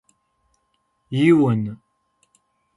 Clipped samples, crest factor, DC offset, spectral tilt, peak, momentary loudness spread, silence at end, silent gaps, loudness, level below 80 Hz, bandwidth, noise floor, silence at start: under 0.1%; 20 dB; under 0.1%; -8 dB/octave; -4 dBFS; 17 LU; 1 s; none; -19 LUFS; -62 dBFS; 11.5 kHz; -70 dBFS; 1.1 s